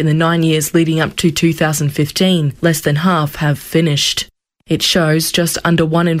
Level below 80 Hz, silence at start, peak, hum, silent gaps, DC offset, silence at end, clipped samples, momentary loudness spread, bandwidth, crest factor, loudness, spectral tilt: -44 dBFS; 0 s; -2 dBFS; none; none; under 0.1%; 0 s; under 0.1%; 4 LU; 16 kHz; 12 dB; -14 LUFS; -4.5 dB/octave